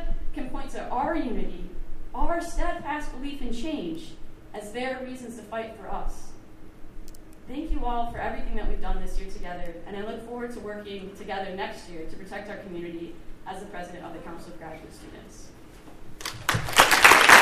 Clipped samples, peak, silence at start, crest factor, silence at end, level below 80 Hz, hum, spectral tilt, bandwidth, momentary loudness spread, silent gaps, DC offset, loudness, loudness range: under 0.1%; 0 dBFS; 0 s; 26 dB; 0 s; -34 dBFS; none; -2.5 dB/octave; 15.5 kHz; 14 LU; none; under 0.1%; -26 LUFS; 7 LU